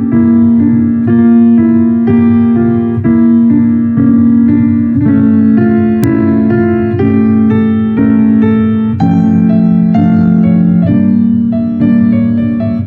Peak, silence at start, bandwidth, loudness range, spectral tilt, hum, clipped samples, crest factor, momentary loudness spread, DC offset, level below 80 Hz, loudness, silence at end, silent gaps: 0 dBFS; 0 s; 3.8 kHz; 1 LU; -10.5 dB/octave; none; under 0.1%; 8 dB; 3 LU; under 0.1%; -40 dBFS; -9 LUFS; 0 s; none